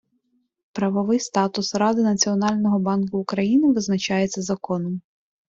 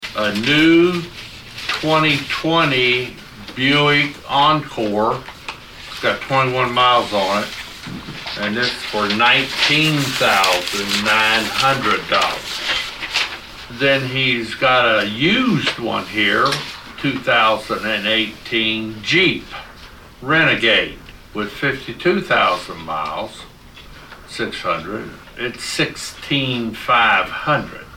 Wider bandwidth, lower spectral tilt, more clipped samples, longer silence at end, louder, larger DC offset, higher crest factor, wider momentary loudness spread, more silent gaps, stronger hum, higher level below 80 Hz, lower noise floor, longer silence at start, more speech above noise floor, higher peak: second, 7.8 kHz vs 17.5 kHz; about the same, -5 dB/octave vs -4 dB/octave; neither; first, 0.5 s vs 0 s; second, -22 LUFS vs -17 LUFS; neither; about the same, 16 dB vs 16 dB; second, 8 LU vs 16 LU; neither; neither; second, -62 dBFS vs -46 dBFS; first, -69 dBFS vs -40 dBFS; first, 0.75 s vs 0 s; first, 48 dB vs 23 dB; second, -6 dBFS vs -2 dBFS